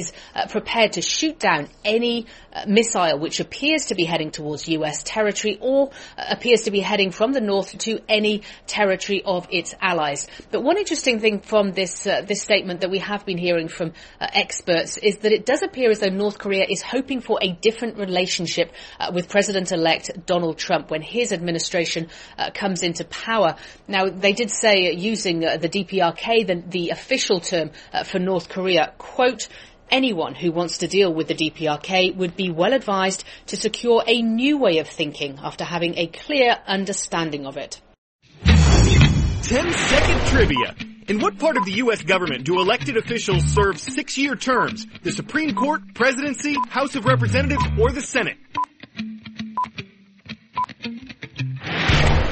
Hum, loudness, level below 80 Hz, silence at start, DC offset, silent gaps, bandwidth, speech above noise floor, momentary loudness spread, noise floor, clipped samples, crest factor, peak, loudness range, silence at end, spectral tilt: none; -21 LUFS; -34 dBFS; 0 s; under 0.1%; 37.98-38.19 s; 8.8 kHz; 22 dB; 10 LU; -44 dBFS; under 0.1%; 20 dB; 0 dBFS; 4 LU; 0 s; -4.5 dB/octave